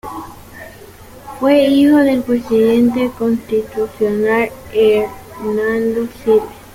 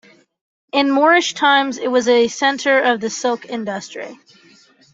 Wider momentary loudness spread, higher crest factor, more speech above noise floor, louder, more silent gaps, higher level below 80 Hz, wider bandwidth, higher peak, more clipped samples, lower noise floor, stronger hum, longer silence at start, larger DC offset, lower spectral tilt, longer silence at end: first, 20 LU vs 13 LU; about the same, 14 dB vs 16 dB; second, 24 dB vs 34 dB; about the same, -15 LUFS vs -16 LUFS; neither; first, -46 dBFS vs -66 dBFS; first, 16.5 kHz vs 8 kHz; about the same, -2 dBFS vs -2 dBFS; neither; second, -37 dBFS vs -50 dBFS; neither; second, 0.05 s vs 0.75 s; neither; first, -6 dB/octave vs -2.5 dB/octave; second, 0.15 s vs 0.8 s